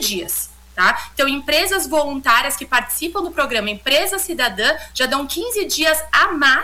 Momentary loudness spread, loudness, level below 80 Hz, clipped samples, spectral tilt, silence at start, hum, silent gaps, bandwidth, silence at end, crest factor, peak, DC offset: 7 LU; -17 LUFS; -44 dBFS; under 0.1%; -1 dB/octave; 0 s; none; none; 18 kHz; 0 s; 14 dB; -4 dBFS; under 0.1%